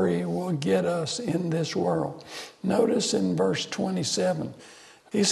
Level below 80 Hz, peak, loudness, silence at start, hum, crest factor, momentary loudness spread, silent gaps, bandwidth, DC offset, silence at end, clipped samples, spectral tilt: -66 dBFS; -8 dBFS; -26 LUFS; 0 s; none; 18 dB; 9 LU; none; 12.5 kHz; under 0.1%; 0 s; under 0.1%; -5 dB/octave